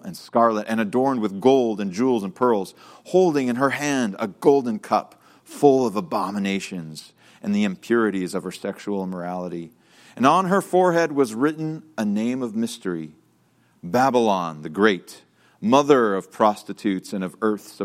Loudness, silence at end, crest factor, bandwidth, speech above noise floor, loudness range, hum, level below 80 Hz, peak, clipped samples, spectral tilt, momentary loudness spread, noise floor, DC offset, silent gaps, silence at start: -22 LUFS; 0 s; 20 dB; 15.5 kHz; 39 dB; 4 LU; none; -70 dBFS; -2 dBFS; under 0.1%; -5.5 dB/octave; 12 LU; -61 dBFS; under 0.1%; none; 0.05 s